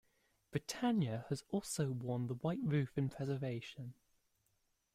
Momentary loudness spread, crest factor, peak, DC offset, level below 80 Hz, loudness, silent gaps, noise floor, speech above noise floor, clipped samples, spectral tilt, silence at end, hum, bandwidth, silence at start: 9 LU; 18 dB; -22 dBFS; under 0.1%; -70 dBFS; -40 LUFS; none; -81 dBFS; 42 dB; under 0.1%; -6 dB/octave; 1.05 s; none; 15.5 kHz; 0.5 s